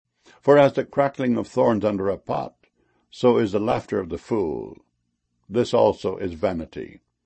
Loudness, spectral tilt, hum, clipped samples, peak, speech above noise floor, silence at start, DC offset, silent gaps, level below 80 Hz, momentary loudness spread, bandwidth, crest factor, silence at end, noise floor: -22 LUFS; -7 dB/octave; 60 Hz at -55 dBFS; under 0.1%; -4 dBFS; 52 dB; 0.45 s; under 0.1%; none; -54 dBFS; 14 LU; 8.6 kHz; 18 dB; 0.4 s; -74 dBFS